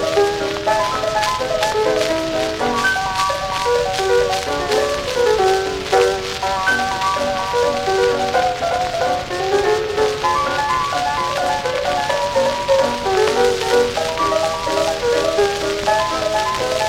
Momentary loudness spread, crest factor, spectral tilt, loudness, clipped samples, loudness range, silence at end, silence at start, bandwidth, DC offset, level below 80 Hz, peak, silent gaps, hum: 3 LU; 18 dB; -3 dB/octave; -18 LUFS; under 0.1%; 1 LU; 0 s; 0 s; 17 kHz; under 0.1%; -40 dBFS; 0 dBFS; none; none